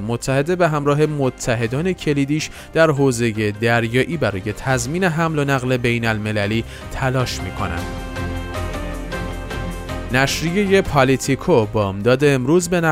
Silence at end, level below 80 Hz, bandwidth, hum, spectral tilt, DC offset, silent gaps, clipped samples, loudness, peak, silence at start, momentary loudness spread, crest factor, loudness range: 0 s; -36 dBFS; 16 kHz; none; -5.5 dB/octave; under 0.1%; none; under 0.1%; -19 LUFS; -2 dBFS; 0 s; 11 LU; 16 dB; 6 LU